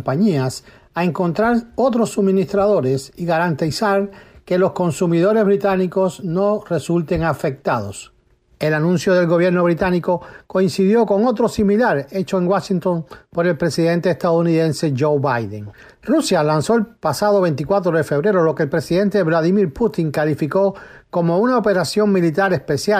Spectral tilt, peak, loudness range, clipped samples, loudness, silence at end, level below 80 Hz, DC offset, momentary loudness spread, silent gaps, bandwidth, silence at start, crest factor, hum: -6.5 dB/octave; -6 dBFS; 2 LU; under 0.1%; -18 LUFS; 0 s; -48 dBFS; under 0.1%; 7 LU; none; 15.5 kHz; 0 s; 12 dB; none